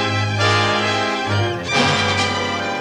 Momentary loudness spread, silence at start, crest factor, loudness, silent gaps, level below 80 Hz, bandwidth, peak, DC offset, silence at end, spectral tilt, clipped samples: 5 LU; 0 s; 16 dB; -17 LUFS; none; -50 dBFS; 11 kHz; -2 dBFS; under 0.1%; 0 s; -4 dB/octave; under 0.1%